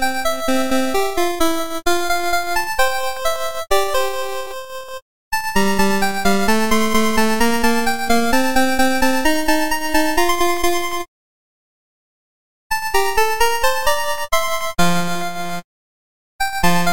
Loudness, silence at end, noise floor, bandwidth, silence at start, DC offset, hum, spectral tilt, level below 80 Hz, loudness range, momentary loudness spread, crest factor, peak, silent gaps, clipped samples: -18 LUFS; 0 s; under -90 dBFS; 17 kHz; 0 s; 9%; none; -3.5 dB/octave; -38 dBFS; 5 LU; 9 LU; 14 dB; -4 dBFS; 5.02-5.31 s, 11.08-12.70 s, 15.64-16.39 s; under 0.1%